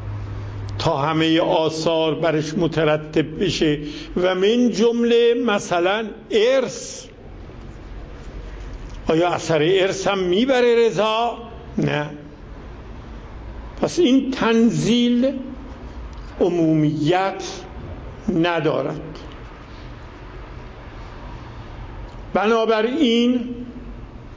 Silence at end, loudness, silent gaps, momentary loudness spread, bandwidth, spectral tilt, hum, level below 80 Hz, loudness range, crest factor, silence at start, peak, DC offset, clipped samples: 0 s; -19 LUFS; none; 21 LU; 8 kHz; -5.5 dB/octave; none; -40 dBFS; 7 LU; 16 dB; 0 s; -4 dBFS; under 0.1%; under 0.1%